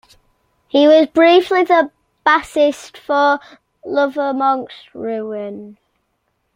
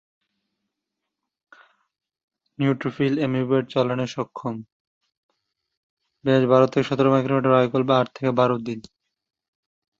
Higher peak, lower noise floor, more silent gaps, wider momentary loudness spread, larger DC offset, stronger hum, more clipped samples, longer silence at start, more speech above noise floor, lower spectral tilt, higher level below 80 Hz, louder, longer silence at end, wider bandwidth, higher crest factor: about the same, -2 dBFS vs -4 dBFS; second, -68 dBFS vs -83 dBFS; second, none vs 4.72-5.01 s, 5.17-5.29 s, 5.77-5.97 s; first, 17 LU vs 12 LU; neither; neither; neither; second, 0.75 s vs 2.6 s; second, 53 dB vs 62 dB; second, -4 dB/octave vs -7.5 dB/octave; about the same, -60 dBFS vs -64 dBFS; first, -15 LUFS vs -21 LUFS; second, 0.85 s vs 1.2 s; first, 15.5 kHz vs 7.6 kHz; about the same, 16 dB vs 20 dB